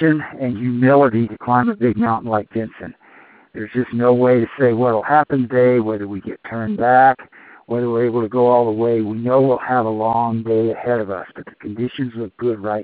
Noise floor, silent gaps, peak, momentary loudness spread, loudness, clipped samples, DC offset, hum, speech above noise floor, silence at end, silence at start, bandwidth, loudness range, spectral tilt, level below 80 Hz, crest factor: -47 dBFS; none; 0 dBFS; 13 LU; -17 LUFS; under 0.1%; under 0.1%; none; 30 dB; 0 s; 0 s; 4.6 kHz; 3 LU; -7 dB/octave; -58 dBFS; 16 dB